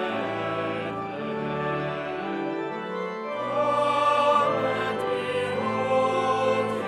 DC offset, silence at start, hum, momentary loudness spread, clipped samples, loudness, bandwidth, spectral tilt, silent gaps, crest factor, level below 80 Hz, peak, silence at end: under 0.1%; 0 s; none; 10 LU; under 0.1%; -26 LUFS; 12 kHz; -5.5 dB/octave; none; 16 dB; -64 dBFS; -10 dBFS; 0 s